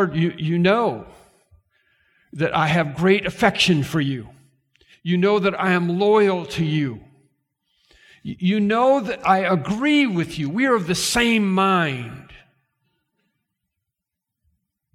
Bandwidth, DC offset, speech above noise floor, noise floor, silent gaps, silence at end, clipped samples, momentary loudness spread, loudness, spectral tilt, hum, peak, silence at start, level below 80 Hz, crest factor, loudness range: 15.5 kHz; under 0.1%; 64 dB; -83 dBFS; none; 2.6 s; under 0.1%; 10 LU; -19 LUFS; -5.5 dB/octave; none; -2 dBFS; 0 s; -52 dBFS; 18 dB; 3 LU